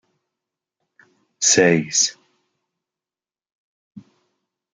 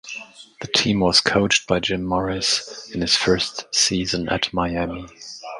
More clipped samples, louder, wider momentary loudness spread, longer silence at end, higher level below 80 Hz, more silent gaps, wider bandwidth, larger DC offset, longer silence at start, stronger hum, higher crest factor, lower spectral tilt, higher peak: neither; first, -16 LUFS vs -20 LUFS; second, 6 LU vs 18 LU; first, 0.75 s vs 0 s; second, -66 dBFS vs -44 dBFS; first, 3.52-3.91 s vs none; about the same, 10.5 kHz vs 11.5 kHz; neither; first, 1.4 s vs 0.05 s; neither; about the same, 22 dB vs 22 dB; about the same, -2.5 dB/octave vs -3 dB/octave; about the same, -2 dBFS vs 0 dBFS